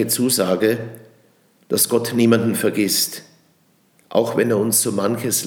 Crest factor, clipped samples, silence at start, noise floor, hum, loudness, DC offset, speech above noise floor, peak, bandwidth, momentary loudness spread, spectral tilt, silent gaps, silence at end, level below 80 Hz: 18 dB; under 0.1%; 0 s; -59 dBFS; none; -18 LUFS; under 0.1%; 40 dB; -2 dBFS; over 20 kHz; 7 LU; -3.5 dB/octave; none; 0 s; -72 dBFS